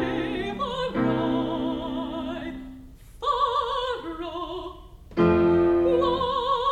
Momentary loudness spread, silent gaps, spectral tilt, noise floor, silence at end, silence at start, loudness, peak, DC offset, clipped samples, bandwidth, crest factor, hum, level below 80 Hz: 14 LU; none; -7 dB/octave; -45 dBFS; 0 s; 0 s; -25 LUFS; -8 dBFS; under 0.1%; under 0.1%; 8.4 kHz; 16 dB; none; -46 dBFS